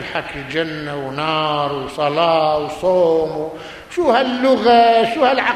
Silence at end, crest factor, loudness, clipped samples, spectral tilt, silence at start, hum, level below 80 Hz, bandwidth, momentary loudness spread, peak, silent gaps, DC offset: 0 s; 14 dB; -17 LUFS; under 0.1%; -5.5 dB/octave; 0 s; none; -50 dBFS; 14 kHz; 13 LU; -2 dBFS; none; under 0.1%